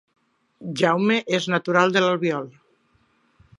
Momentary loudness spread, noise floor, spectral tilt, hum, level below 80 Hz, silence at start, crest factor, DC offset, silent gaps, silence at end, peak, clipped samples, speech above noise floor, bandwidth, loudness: 14 LU; -64 dBFS; -5 dB/octave; none; -70 dBFS; 0.6 s; 20 dB; under 0.1%; none; 1.1 s; -2 dBFS; under 0.1%; 43 dB; 11.5 kHz; -21 LUFS